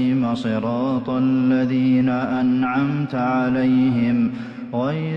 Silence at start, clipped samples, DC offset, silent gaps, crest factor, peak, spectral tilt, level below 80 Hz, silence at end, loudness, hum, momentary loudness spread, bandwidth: 0 s; under 0.1%; under 0.1%; none; 10 dB; -10 dBFS; -9 dB/octave; -56 dBFS; 0 s; -20 LUFS; none; 5 LU; 5.8 kHz